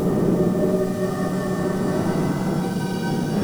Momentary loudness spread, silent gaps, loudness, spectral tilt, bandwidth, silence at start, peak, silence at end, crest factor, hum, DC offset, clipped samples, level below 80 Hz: 4 LU; none; -22 LUFS; -7 dB/octave; over 20 kHz; 0 s; -8 dBFS; 0 s; 14 dB; none; under 0.1%; under 0.1%; -44 dBFS